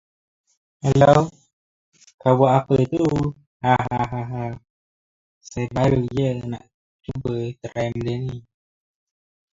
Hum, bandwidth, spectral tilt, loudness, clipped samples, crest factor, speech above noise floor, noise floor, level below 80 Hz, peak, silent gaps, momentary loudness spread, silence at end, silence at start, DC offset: none; 7.8 kHz; -7.5 dB/octave; -21 LUFS; under 0.1%; 22 dB; over 70 dB; under -90 dBFS; -48 dBFS; 0 dBFS; 1.53-1.92 s, 2.14-2.18 s, 3.47-3.60 s, 4.70-5.41 s, 6.74-6.99 s; 16 LU; 1.15 s; 0.85 s; under 0.1%